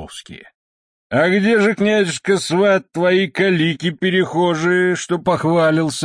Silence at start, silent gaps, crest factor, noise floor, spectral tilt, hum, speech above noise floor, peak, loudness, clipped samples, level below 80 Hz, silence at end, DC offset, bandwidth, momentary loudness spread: 0 s; 0.55-1.10 s; 14 dB; under -90 dBFS; -5.5 dB/octave; none; over 74 dB; -4 dBFS; -16 LUFS; under 0.1%; -56 dBFS; 0 s; under 0.1%; 10.5 kHz; 4 LU